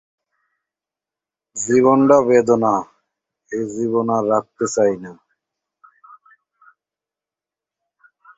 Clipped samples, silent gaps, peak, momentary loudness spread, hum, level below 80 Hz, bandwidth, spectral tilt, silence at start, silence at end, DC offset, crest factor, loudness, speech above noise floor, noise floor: under 0.1%; none; -2 dBFS; 17 LU; none; -62 dBFS; 8.2 kHz; -6 dB/octave; 1.55 s; 3.25 s; under 0.1%; 18 dB; -17 LUFS; 72 dB; -89 dBFS